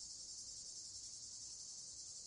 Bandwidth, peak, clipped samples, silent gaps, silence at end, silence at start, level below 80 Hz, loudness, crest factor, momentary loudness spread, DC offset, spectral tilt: 12 kHz; -38 dBFS; under 0.1%; none; 0 s; 0 s; -78 dBFS; -49 LUFS; 14 dB; 1 LU; under 0.1%; 1 dB/octave